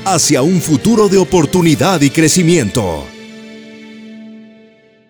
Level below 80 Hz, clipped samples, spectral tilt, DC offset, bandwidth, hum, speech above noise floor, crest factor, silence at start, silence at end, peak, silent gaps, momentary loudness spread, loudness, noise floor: -40 dBFS; under 0.1%; -4.5 dB/octave; under 0.1%; over 20 kHz; none; 34 dB; 12 dB; 0 s; 0.7 s; 0 dBFS; none; 23 LU; -11 LUFS; -45 dBFS